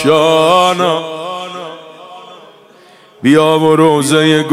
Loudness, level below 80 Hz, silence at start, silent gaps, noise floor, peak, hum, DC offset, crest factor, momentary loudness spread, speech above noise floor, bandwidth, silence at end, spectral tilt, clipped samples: -11 LUFS; -58 dBFS; 0 s; none; -42 dBFS; 0 dBFS; none; under 0.1%; 12 dB; 16 LU; 33 dB; 15.5 kHz; 0 s; -5 dB/octave; under 0.1%